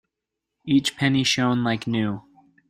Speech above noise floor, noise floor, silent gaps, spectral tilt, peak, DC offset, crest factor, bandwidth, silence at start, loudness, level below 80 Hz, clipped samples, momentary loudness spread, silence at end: 62 dB; -83 dBFS; none; -4.5 dB/octave; -6 dBFS; under 0.1%; 18 dB; 14 kHz; 0.65 s; -22 LUFS; -58 dBFS; under 0.1%; 10 LU; 0.5 s